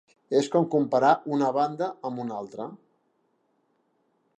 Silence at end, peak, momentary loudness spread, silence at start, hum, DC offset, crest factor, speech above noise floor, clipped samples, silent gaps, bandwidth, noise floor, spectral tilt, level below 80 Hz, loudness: 1.65 s; -8 dBFS; 14 LU; 0.3 s; none; under 0.1%; 20 dB; 46 dB; under 0.1%; none; 11 kHz; -71 dBFS; -6.5 dB/octave; -82 dBFS; -25 LUFS